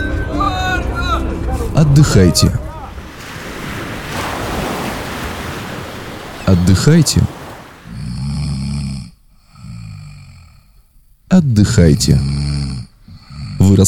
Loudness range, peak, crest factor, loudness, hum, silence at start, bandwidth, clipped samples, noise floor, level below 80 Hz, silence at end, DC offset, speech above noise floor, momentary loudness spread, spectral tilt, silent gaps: 10 LU; 0 dBFS; 16 dB; -15 LUFS; none; 0 s; 18.5 kHz; under 0.1%; -48 dBFS; -26 dBFS; 0 s; under 0.1%; 38 dB; 21 LU; -5.5 dB/octave; none